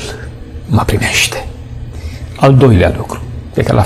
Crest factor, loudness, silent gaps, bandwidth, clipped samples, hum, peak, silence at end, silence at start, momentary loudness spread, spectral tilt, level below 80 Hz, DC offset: 12 dB; -11 LUFS; none; 14.5 kHz; under 0.1%; none; 0 dBFS; 0 s; 0 s; 20 LU; -5.5 dB/octave; -26 dBFS; under 0.1%